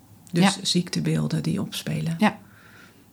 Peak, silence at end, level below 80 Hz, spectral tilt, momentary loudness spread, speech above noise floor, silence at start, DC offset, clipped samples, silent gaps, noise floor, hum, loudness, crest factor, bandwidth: -6 dBFS; 0.25 s; -62 dBFS; -5 dB/octave; 8 LU; 27 dB; 0.35 s; under 0.1%; under 0.1%; none; -50 dBFS; none; -24 LUFS; 20 dB; over 20 kHz